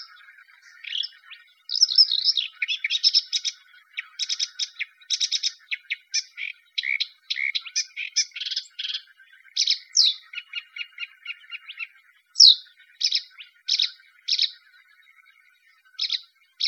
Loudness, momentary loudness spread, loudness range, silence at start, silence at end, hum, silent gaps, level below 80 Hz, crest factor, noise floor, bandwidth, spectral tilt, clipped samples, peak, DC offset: -22 LUFS; 19 LU; 7 LU; 0 s; 0 s; none; none; under -90 dBFS; 26 dB; -59 dBFS; 16.5 kHz; 13.5 dB/octave; under 0.1%; 0 dBFS; under 0.1%